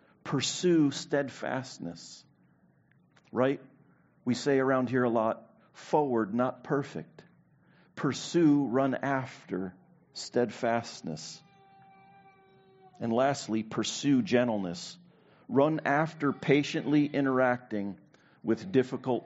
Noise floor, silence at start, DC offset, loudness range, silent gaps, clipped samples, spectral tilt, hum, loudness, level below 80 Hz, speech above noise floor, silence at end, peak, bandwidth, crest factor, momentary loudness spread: -65 dBFS; 0.25 s; under 0.1%; 7 LU; none; under 0.1%; -5 dB/octave; none; -29 LUFS; -74 dBFS; 36 dB; 0 s; -8 dBFS; 8 kHz; 22 dB; 15 LU